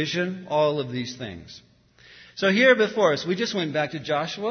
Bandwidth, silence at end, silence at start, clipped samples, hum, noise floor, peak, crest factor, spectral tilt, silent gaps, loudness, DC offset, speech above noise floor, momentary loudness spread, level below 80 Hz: 6.6 kHz; 0 s; 0 s; under 0.1%; none; -53 dBFS; -4 dBFS; 20 dB; -5 dB/octave; none; -23 LUFS; under 0.1%; 30 dB; 17 LU; -64 dBFS